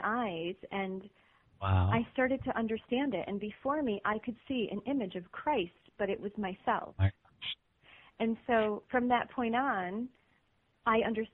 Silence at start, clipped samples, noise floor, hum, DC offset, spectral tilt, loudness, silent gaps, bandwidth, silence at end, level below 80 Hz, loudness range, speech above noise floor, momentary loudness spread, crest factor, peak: 0 s; under 0.1%; -73 dBFS; none; under 0.1%; -5 dB/octave; -34 LUFS; none; 4.1 kHz; 0.05 s; -60 dBFS; 3 LU; 40 dB; 10 LU; 18 dB; -16 dBFS